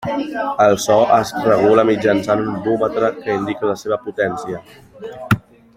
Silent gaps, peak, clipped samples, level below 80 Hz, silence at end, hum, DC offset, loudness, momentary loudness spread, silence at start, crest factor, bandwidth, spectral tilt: none; -2 dBFS; under 0.1%; -52 dBFS; 0.35 s; none; under 0.1%; -17 LUFS; 13 LU; 0 s; 16 dB; 16 kHz; -5.5 dB/octave